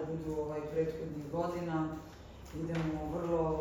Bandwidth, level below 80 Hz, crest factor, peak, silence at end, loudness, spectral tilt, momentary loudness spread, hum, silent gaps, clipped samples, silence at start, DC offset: 16.5 kHz; -52 dBFS; 14 dB; -22 dBFS; 0 s; -37 LUFS; -8 dB/octave; 12 LU; none; none; under 0.1%; 0 s; under 0.1%